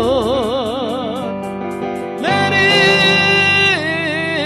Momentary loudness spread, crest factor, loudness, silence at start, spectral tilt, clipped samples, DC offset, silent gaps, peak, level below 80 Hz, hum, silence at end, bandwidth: 13 LU; 14 dB; -14 LUFS; 0 s; -4 dB/octave; under 0.1%; under 0.1%; none; -2 dBFS; -46 dBFS; none; 0 s; 14.5 kHz